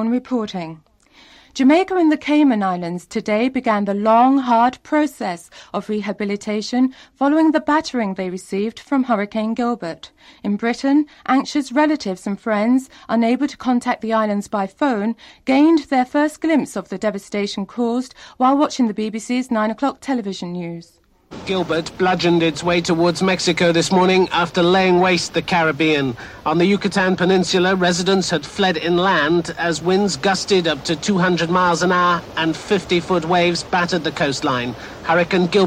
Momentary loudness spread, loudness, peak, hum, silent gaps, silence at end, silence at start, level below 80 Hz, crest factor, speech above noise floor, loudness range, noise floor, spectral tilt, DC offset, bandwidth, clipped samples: 10 LU; -18 LUFS; -6 dBFS; none; none; 0 s; 0 s; -52 dBFS; 14 dB; 32 dB; 4 LU; -50 dBFS; -5 dB/octave; under 0.1%; 13.5 kHz; under 0.1%